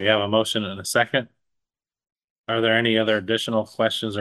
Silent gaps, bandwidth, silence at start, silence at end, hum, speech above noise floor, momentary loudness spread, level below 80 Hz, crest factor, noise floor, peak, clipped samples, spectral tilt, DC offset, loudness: 2.24-2.44 s; 12.5 kHz; 0 s; 0 s; none; 64 dB; 7 LU; -66 dBFS; 18 dB; -86 dBFS; -6 dBFS; under 0.1%; -4 dB/octave; under 0.1%; -22 LUFS